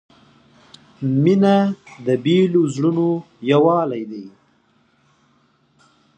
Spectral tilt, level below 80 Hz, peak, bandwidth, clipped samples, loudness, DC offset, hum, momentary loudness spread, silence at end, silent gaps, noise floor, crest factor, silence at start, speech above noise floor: -8 dB/octave; -68 dBFS; -2 dBFS; 8.6 kHz; under 0.1%; -18 LUFS; under 0.1%; none; 12 LU; 1.9 s; none; -60 dBFS; 18 dB; 1 s; 43 dB